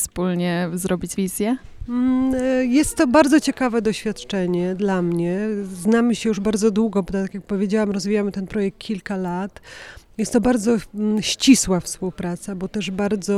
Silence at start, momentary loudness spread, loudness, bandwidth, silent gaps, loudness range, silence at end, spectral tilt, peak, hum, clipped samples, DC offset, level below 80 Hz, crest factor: 0 s; 11 LU; -21 LUFS; 15.5 kHz; none; 4 LU; 0 s; -5 dB/octave; -2 dBFS; none; under 0.1%; under 0.1%; -44 dBFS; 18 dB